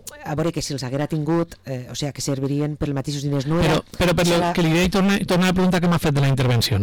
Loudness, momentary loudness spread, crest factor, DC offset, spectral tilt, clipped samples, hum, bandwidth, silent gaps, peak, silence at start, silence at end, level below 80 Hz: -21 LUFS; 8 LU; 8 dB; 0.3%; -5.5 dB/octave; under 0.1%; none; 19 kHz; none; -12 dBFS; 0.05 s; 0 s; -40 dBFS